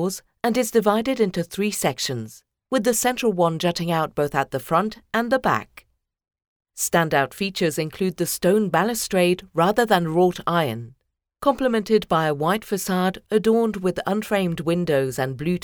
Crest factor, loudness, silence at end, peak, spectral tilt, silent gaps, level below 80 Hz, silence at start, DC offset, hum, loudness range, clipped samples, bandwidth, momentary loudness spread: 18 dB; -22 LUFS; 0.05 s; -4 dBFS; -4.5 dB/octave; 6.48-6.60 s; -54 dBFS; 0 s; under 0.1%; none; 3 LU; under 0.1%; over 20 kHz; 6 LU